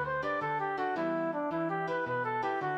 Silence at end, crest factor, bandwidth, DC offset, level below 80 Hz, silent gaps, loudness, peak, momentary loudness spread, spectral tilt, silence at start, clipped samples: 0 s; 10 dB; 8.6 kHz; under 0.1%; -66 dBFS; none; -33 LUFS; -22 dBFS; 1 LU; -7 dB/octave; 0 s; under 0.1%